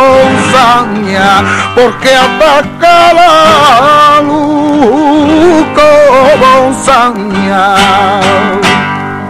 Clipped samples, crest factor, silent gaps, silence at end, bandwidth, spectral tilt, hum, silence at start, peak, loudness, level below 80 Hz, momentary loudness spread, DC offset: 6%; 6 dB; none; 0 s; 16 kHz; -4.5 dB/octave; none; 0 s; 0 dBFS; -5 LUFS; -34 dBFS; 6 LU; under 0.1%